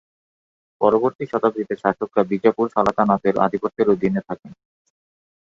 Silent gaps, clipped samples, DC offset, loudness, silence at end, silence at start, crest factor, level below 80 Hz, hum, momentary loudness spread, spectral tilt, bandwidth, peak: 1.15-1.19 s; under 0.1%; under 0.1%; -20 LUFS; 0.95 s; 0.8 s; 20 dB; -58 dBFS; none; 5 LU; -8.5 dB/octave; 7.4 kHz; 0 dBFS